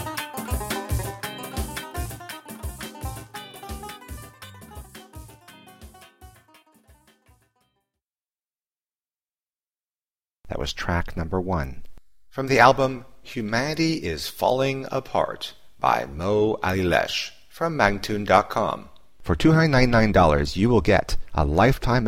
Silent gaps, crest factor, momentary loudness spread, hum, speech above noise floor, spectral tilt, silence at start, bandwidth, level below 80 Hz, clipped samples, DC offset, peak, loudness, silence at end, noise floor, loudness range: 8.81-8.85 s, 9.49-9.53 s, 9.84-9.88 s, 10.33-10.37 s; 24 dB; 20 LU; none; over 69 dB; -5.5 dB/octave; 0 s; 16.5 kHz; -36 dBFS; under 0.1%; under 0.1%; 0 dBFS; -23 LUFS; 0 s; under -90 dBFS; 19 LU